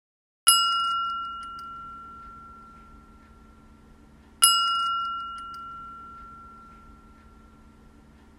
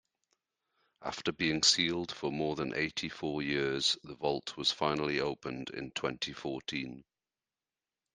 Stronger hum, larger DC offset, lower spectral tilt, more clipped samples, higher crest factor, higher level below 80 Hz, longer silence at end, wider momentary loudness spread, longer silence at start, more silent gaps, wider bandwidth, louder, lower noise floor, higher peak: neither; neither; second, 1.5 dB/octave vs -3 dB/octave; neither; about the same, 28 dB vs 24 dB; first, -56 dBFS vs -66 dBFS; first, 1.45 s vs 1.15 s; first, 26 LU vs 13 LU; second, 0.45 s vs 1 s; neither; first, 16 kHz vs 10 kHz; first, -22 LUFS vs -33 LUFS; second, -53 dBFS vs under -90 dBFS; first, -2 dBFS vs -12 dBFS